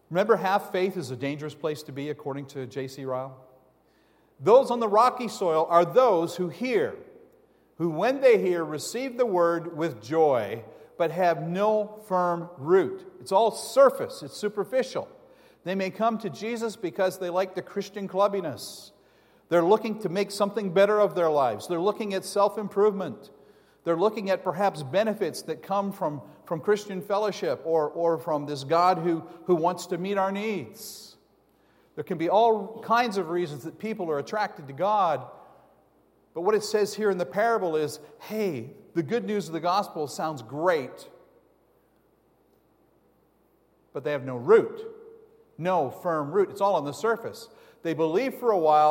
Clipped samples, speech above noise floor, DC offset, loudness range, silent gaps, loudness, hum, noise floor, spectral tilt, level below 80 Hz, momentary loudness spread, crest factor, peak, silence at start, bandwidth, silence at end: under 0.1%; 39 dB; under 0.1%; 6 LU; none; -26 LUFS; none; -65 dBFS; -5.5 dB/octave; -76 dBFS; 14 LU; 20 dB; -6 dBFS; 0.1 s; 16.5 kHz; 0 s